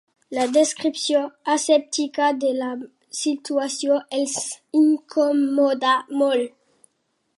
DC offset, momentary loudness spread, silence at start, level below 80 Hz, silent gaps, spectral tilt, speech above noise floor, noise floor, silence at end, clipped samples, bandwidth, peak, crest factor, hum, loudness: under 0.1%; 8 LU; 0.3 s; -80 dBFS; none; -1.5 dB/octave; 51 dB; -72 dBFS; 0.9 s; under 0.1%; 11.5 kHz; -6 dBFS; 16 dB; none; -21 LUFS